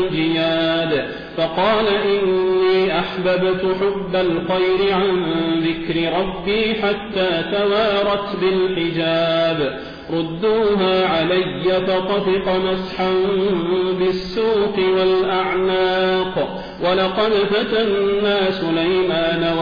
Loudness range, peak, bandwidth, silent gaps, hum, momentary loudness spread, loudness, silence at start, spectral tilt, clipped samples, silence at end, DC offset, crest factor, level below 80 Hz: 1 LU; -8 dBFS; 5.2 kHz; none; none; 4 LU; -18 LUFS; 0 s; -7.5 dB/octave; under 0.1%; 0 s; under 0.1%; 10 dB; -44 dBFS